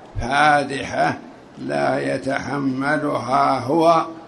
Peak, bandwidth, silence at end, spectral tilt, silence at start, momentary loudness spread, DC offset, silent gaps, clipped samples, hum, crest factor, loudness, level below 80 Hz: -4 dBFS; 11.5 kHz; 0 s; -5.5 dB/octave; 0 s; 8 LU; under 0.1%; none; under 0.1%; none; 16 dB; -20 LUFS; -44 dBFS